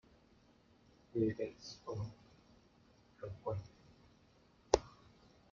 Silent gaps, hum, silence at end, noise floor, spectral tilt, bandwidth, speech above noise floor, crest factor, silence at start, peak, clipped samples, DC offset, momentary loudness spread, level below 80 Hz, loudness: none; none; 0.6 s; -68 dBFS; -6 dB/octave; 7.4 kHz; 27 dB; 34 dB; 1.15 s; -10 dBFS; under 0.1%; under 0.1%; 24 LU; -62 dBFS; -41 LUFS